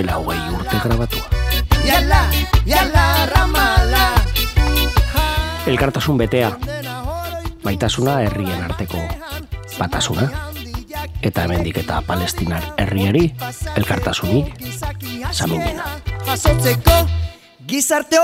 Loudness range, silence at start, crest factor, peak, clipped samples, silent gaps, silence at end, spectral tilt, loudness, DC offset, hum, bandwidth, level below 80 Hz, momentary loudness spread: 7 LU; 0 s; 18 dB; 0 dBFS; under 0.1%; none; 0 s; -4.5 dB/octave; -18 LUFS; under 0.1%; none; 16.5 kHz; -22 dBFS; 12 LU